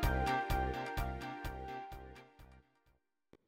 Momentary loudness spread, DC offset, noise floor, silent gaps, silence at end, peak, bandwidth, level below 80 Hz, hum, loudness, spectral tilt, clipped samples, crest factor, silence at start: 20 LU; under 0.1%; -77 dBFS; none; 0.9 s; -22 dBFS; 16.5 kHz; -44 dBFS; none; -39 LUFS; -5.5 dB/octave; under 0.1%; 18 dB; 0 s